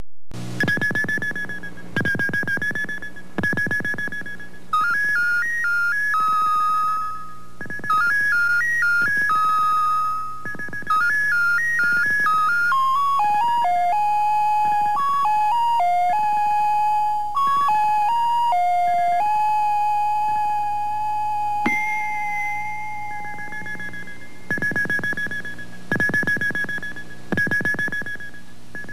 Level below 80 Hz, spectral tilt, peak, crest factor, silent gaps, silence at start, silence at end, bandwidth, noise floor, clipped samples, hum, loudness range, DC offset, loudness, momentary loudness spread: -54 dBFS; -4 dB/octave; -8 dBFS; 14 dB; none; 0 s; 0 s; 15.5 kHz; -42 dBFS; under 0.1%; none; 6 LU; 3%; -20 LUFS; 13 LU